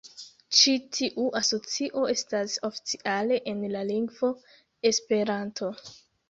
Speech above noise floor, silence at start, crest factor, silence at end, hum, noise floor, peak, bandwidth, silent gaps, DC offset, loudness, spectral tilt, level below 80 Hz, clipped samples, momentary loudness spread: 19 dB; 0.05 s; 24 dB; 0.35 s; none; -46 dBFS; -4 dBFS; 8 kHz; none; under 0.1%; -27 LUFS; -2.5 dB/octave; -72 dBFS; under 0.1%; 13 LU